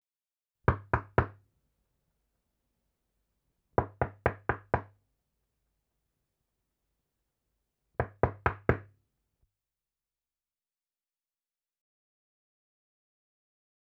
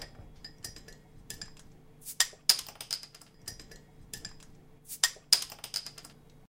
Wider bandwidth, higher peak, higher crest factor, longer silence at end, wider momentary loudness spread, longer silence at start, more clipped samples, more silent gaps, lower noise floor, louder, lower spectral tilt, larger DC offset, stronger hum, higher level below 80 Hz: second, 5.6 kHz vs 16.5 kHz; about the same, -6 dBFS vs -4 dBFS; about the same, 32 dB vs 34 dB; first, 5 s vs 0.35 s; second, 7 LU vs 23 LU; first, 0.7 s vs 0 s; neither; neither; first, under -90 dBFS vs -54 dBFS; second, -33 LUFS vs -29 LUFS; first, -9.5 dB/octave vs 1 dB/octave; neither; neither; first, -50 dBFS vs -58 dBFS